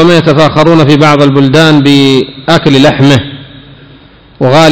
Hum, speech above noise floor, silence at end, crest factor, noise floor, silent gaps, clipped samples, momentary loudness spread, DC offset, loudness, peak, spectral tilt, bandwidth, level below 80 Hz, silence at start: none; 31 dB; 0 s; 6 dB; -36 dBFS; none; 20%; 5 LU; under 0.1%; -5 LUFS; 0 dBFS; -6 dB/octave; 8 kHz; -36 dBFS; 0 s